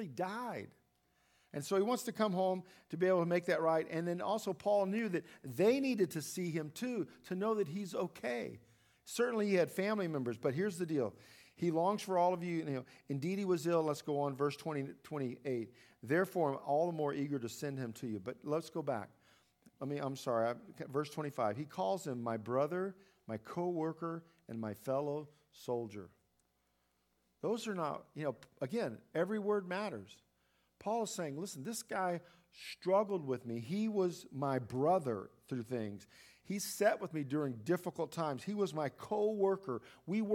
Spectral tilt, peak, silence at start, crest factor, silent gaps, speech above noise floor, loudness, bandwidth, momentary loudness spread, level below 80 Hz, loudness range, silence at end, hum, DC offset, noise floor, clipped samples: -6 dB/octave; -18 dBFS; 0 s; 18 dB; none; 42 dB; -38 LUFS; 18 kHz; 11 LU; -82 dBFS; 6 LU; 0 s; none; under 0.1%; -79 dBFS; under 0.1%